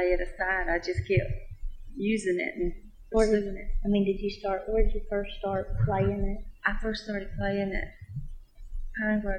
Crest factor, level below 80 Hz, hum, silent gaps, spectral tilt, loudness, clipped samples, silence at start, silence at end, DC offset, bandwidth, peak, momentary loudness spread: 18 dB; -34 dBFS; none; none; -6.5 dB/octave; -30 LUFS; under 0.1%; 0 s; 0 s; under 0.1%; 9.6 kHz; -10 dBFS; 14 LU